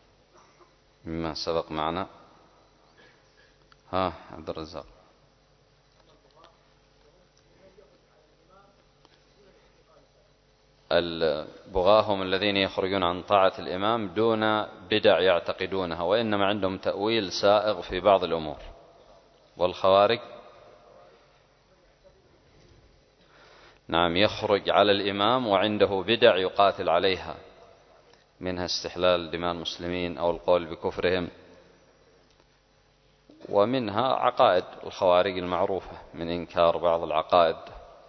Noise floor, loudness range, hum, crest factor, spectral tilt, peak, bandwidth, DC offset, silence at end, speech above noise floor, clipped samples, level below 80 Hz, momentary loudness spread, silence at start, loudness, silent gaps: -63 dBFS; 12 LU; none; 24 dB; -5 dB/octave; -4 dBFS; 6.4 kHz; under 0.1%; 0.2 s; 38 dB; under 0.1%; -54 dBFS; 13 LU; 1.05 s; -25 LUFS; none